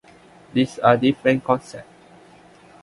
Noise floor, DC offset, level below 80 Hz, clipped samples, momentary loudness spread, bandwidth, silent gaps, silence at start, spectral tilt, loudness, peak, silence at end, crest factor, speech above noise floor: -49 dBFS; under 0.1%; -60 dBFS; under 0.1%; 16 LU; 11.5 kHz; none; 0.55 s; -6.5 dB/octave; -20 LUFS; -2 dBFS; 1 s; 22 dB; 30 dB